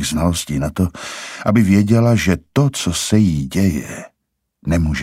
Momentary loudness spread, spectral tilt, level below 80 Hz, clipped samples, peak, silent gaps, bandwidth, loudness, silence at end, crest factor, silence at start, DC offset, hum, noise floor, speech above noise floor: 14 LU; -5.5 dB/octave; -34 dBFS; under 0.1%; -2 dBFS; none; 16 kHz; -17 LUFS; 0 s; 14 dB; 0 s; under 0.1%; none; -74 dBFS; 57 dB